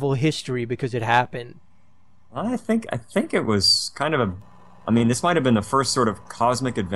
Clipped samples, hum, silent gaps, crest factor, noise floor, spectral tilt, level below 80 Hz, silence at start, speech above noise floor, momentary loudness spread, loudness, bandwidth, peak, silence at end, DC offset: under 0.1%; none; none; 18 dB; -60 dBFS; -4.5 dB/octave; -54 dBFS; 0 s; 38 dB; 11 LU; -22 LUFS; 12.5 kHz; -4 dBFS; 0 s; 0.5%